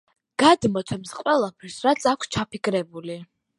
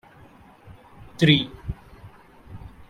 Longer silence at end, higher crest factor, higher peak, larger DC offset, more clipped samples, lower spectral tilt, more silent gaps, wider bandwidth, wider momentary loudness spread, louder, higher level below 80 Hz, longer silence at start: first, 0.35 s vs 0.2 s; about the same, 22 dB vs 24 dB; about the same, -2 dBFS vs -4 dBFS; neither; neither; second, -4.5 dB/octave vs -6 dB/octave; neither; about the same, 11.5 kHz vs 11.5 kHz; second, 16 LU vs 26 LU; second, -23 LUFS vs -20 LUFS; second, -56 dBFS vs -46 dBFS; second, 0.4 s vs 1.2 s